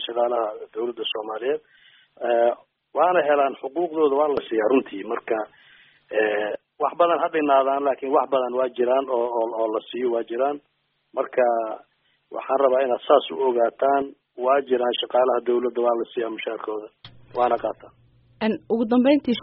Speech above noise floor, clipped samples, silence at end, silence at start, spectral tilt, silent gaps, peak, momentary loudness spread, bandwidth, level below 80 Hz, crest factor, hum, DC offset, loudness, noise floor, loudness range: 32 dB; under 0.1%; 0 s; 0 s; -2.5 dB/octave; none; -4 dBFS; 11 LU; 4.8 kHz; -68 dBFS; 18 dB; none; under 0.1%; -23 LUFS; -54 dBFS; 4 LU